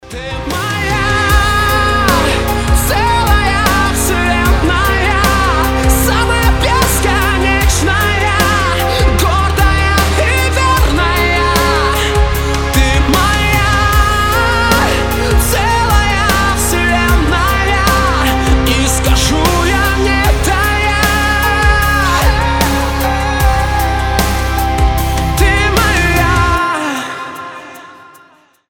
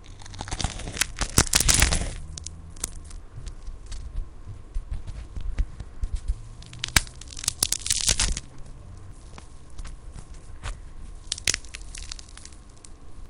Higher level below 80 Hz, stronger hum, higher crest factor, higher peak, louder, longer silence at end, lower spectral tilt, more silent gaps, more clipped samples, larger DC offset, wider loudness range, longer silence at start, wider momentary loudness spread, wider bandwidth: first, -16 dBFS vs -34 dBFS; neither; second, 12 dB vs 30 dB; about the same, 0 dBFS vs 0 dBFS; first, -12 LUFS vs -26 LUFS; first, 0.75 s vs 0 s; first, -4 dB/octave vs -1.5 dB/octave; neither; neither; neither; second, 1 LU vs 14 LU; about the same, 0.05 s vs 0 s; second, 3 LU vs 24 LU; first, 19 kHz vs 15.5 kHz